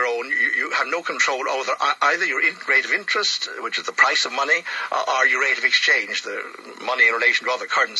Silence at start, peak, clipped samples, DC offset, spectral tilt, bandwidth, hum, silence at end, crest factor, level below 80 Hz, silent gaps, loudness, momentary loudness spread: 0 s; -2 dBFS; under 0.1%; under 0.1%; 0.5 dB/octave; 12 kHz; none; 0 s; 20 dB; -80 dBFS; none; -19 LUFS; 9 LU